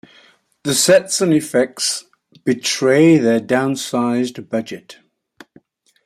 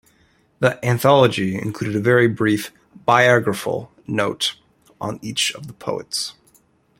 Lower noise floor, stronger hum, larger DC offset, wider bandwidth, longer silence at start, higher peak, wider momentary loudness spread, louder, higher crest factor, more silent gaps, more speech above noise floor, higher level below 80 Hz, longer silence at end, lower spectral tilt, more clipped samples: second, -52 dBFS vs -59 dBFS; neither; neither; about the same, 15.5 kHz vs 16.5 kHz; about the same, 0.65 s vs 0.6 s; about the same, -2 dBFS vs 0 dBFS; about the same, 13 LU vs 14 LU; first, -16 LUFS vs -19 LUFS; about the same, 16 dB vs 20 dB; neither; second, 36 dB vs 40 dB; about the same, -62 dBFS vs -58 dBFS; first, 1.15 s vs 0.7 s; about the same, -4 dB/octave vs -4.5 dB/octave; neither